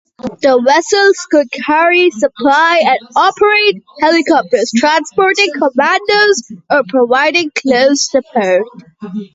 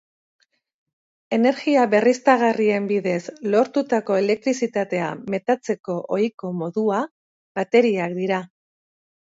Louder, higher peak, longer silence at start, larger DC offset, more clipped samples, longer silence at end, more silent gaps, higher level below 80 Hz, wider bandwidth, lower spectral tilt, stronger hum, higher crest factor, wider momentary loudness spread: first, -11 LUFS vs -21 LUFS; about the same, 0 dBFS vs -2 dBFS; second, 0.2 s vs 1.3 s; neither; neither; second, 0.1 s vs 0.75 s; second, none vs 5.80-5.84 s, 6.34-6.38 s, 7.11-7.55 s; first, -56 dBFS vs -72 dBFS; about the same, 8 kHz vs 7.8 kHz; second, -2.5 dB/octave vs -6 dB/octave; neither; second, 12 dB vs 20 dB; second, 6 LU vs 9 LU